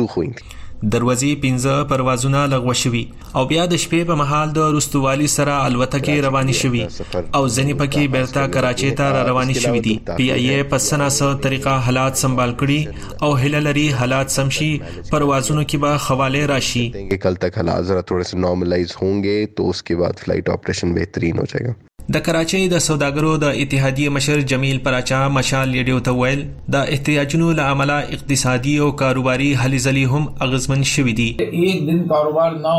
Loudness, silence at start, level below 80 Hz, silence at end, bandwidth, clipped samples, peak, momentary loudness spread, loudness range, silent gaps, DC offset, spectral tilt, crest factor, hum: -18 LUFS; 0 s; -38 dBFS; 0 s; 15.5 kHz; under 0.1%; -2 dBFS; 5 LU; 3 LU; none; under 0.1%; -5 dB/octave; 16 dB; none